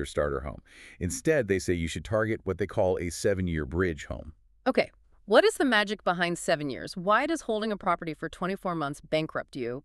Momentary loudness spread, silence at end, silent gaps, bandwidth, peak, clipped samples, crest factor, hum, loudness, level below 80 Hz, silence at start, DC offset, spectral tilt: 11 LU; 0.05 s; none; 13.5 kHz; -6 dBFS; under 0.1%; 22 dB; none; -28 LUFS; -48 dBFS; 0 s; under 0.1%; -5 dB/octave